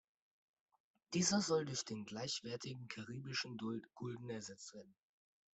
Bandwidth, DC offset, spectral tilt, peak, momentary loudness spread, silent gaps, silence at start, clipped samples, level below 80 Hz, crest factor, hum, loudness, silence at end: 8.2 kHz; under 0.1%; -3.5 dB/octave; -22 dBFS; 14 LU; none; 1.1 s; under 0.1%; -80 dBFS; 22 dB; none; -42 LUFS; 0.6 s